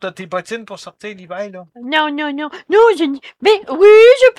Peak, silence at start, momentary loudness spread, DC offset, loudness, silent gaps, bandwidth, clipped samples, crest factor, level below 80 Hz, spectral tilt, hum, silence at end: 0 dBFS; 0 s; 24 LU; under 0.1%; -12 LUFS; none; 10.5 kHz; under 0.1%; 12 dB; -58 dBFS; -4 dB/octave; none; 0.05 s